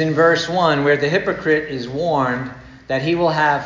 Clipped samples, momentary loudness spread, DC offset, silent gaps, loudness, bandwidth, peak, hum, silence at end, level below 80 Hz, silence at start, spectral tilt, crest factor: under 0.1%; 9 LU; under 0.1%; none; -18 LUFS; 7.6 kHz; -2 dBFS; none; 0 s; -50 dBFS; 0 s; -6 dB/octave; 16 dB